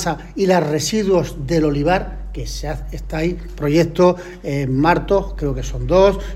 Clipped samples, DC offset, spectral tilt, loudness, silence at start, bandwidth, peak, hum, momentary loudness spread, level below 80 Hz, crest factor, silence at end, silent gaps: under 0.1%; under 0.1%; -6 dB/octave; -18 LUFS; 0 s; 15.5 kHz; -2 dBFS; none; 13 LU; -30 dBFS; 16 dB; 0 s; none